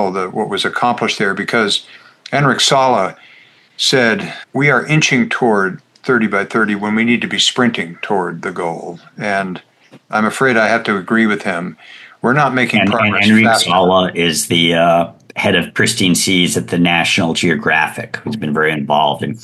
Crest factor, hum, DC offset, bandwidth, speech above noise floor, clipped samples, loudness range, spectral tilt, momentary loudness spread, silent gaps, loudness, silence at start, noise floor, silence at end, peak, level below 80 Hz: 14 dB; none; under 0.1%; 12.5 kHz; 31 dB; under 0.1%; 4 LU; -4 dB/octave; 10 LU; none; -14 LUFS; 0 s; -46 dBFS; 0.05 s; 0 dBFS; -56 dBFS